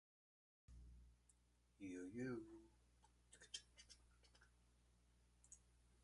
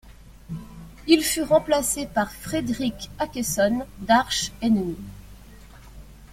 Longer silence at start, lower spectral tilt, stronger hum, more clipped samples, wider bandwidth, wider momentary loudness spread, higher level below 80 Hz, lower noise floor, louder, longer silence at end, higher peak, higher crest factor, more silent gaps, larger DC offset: first, 0.7 s vs 0.05 s; about the same, -4.5 dB/octave vs -3.5 dB/octave; first, 60 Hz at -75 dBFS vs none; neither; second, 11 kHz vs 16.5 kHz; about the same, 17 LU vs 18 LU; second, -74 dBFS vs -46 dBFS; first, -78 dBFS vs -45 dBFS; second, -56 LUFS vs -23 LUFS; about the same, 0 s vs 0.05 s; second, -38 dBFS vs -4 dBFS; about the same, 22 dB vs 22 dB; neither; neither